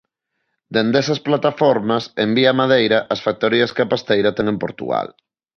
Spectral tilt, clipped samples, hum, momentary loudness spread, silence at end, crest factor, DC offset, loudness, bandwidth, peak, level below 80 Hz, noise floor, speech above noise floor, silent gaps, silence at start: -5.5 dB/octave; under 0.1%; none; 8 LU; 0.5 s; 18 dB; under 0.1%; -18 LUFS; 6.6 kHz; -2 dBFS; -56 dBFS; -74 dBFS; 57 dB; none; 0.7 s